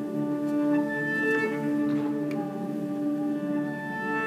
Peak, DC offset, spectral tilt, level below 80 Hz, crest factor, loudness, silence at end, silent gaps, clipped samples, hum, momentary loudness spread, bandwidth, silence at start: -16 dBFS; under 0.1%; -7 dB/octave; -78 dBFS; 12 dB; -28 LUFS; 0 s; none; under 0.1%; none; 6 LU; 14.5 kHz; 0 s